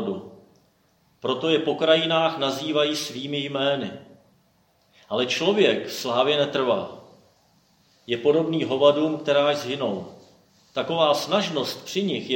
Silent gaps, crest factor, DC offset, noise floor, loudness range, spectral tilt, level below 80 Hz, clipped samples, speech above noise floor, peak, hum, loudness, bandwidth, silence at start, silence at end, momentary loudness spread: none; 20 dB; under 0.1%; -63 dBFS; 2 LU; -4.5 dB/octave; -72 dBFS; under 0.1%; 41 dB; -4 dBFS; none; -23 LUFS; 16.5 kHz; 0 s; 0 s; 11 LU